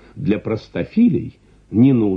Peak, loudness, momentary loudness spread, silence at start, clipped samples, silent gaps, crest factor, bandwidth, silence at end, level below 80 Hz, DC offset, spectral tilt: -2 dBFS; -18 LUFS; 10 LU; 0.15 s; under 0.1%; none; 14 dB; 5.6 kHz; 0 s; -48 dBFS; under 0.1%; -10 dB/octave